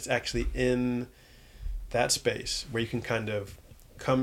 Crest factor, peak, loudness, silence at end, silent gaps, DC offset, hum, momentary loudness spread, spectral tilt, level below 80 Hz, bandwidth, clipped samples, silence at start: 18 dB; -12 dBFS; -30 LUFS; 0 s; none; under 0.1%; none; 16 LU; -4 dB/octave; -42 dBFS; 17 kHz; under 0.1%; 0 s